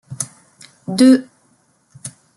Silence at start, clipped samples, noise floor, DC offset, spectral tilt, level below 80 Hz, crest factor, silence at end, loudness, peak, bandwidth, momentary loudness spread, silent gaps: 0.1 s; under 0.1%; -59 dBFS; under 0.1%; -4.5 dB/octave; -64 dBFS; 18 dB; 0.3 s; -15 LUFS; -2 dBFS; 12 kHz; 23 LU; none